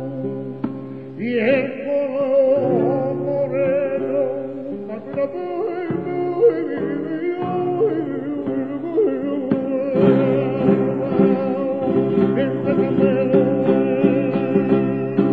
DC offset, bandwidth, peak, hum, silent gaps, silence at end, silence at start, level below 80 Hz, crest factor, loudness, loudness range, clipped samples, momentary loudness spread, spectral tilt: 0.3%; 4.8 kHz; -2 dBFS; none; none; 0 s; 0 s; -60 dBFS; 16 dB; -20 LUFS; 4 LU; under 0.1%; 10 LU; -10.5 dB/octave